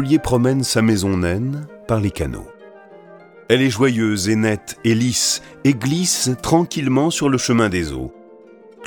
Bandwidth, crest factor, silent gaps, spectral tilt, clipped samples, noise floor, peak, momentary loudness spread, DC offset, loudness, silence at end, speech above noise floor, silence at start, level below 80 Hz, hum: 19 kHz; 18 dB; none; -4.5 dB/octave; under 0.1%; -44 dBFS; -2 dBFS; 9 LU; under 0.1%; -18 LUFS; 0 s; 26 dB; 0 s; -42 dBFS; none